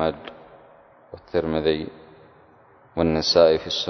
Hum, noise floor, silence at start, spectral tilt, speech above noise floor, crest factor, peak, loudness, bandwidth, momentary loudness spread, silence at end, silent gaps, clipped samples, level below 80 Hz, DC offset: none; -53 dBFS; 0 s; -5 dB/octave; 32 dB; 22 dB; -2 dBFS; -21 LUFS; 6.4 kHz; 21 LU; 0 s; none; under 0.1%; -46 dBFS; under 0.1%